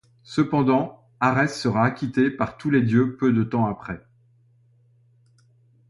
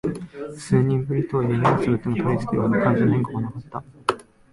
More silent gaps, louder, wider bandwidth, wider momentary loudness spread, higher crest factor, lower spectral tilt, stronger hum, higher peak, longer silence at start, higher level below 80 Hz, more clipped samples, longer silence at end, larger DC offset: neither; about the same, -22 LUFS vs -22 LUFS; about the same, 11.5 kHz vs 11.5 kHz; second, 10 LU vs 15 LU; about the same, 18 dB vs 20 dB; about the same, -7.5 dB/octave vs -8 dB/octave; neither; second, -6 dBFS vs -2 dBFS; first, 0.3 s vs 0.05 s; second, -56 dBFS vs -50 dBFS; neither; first, 1.9 s vs 0.3 s; neither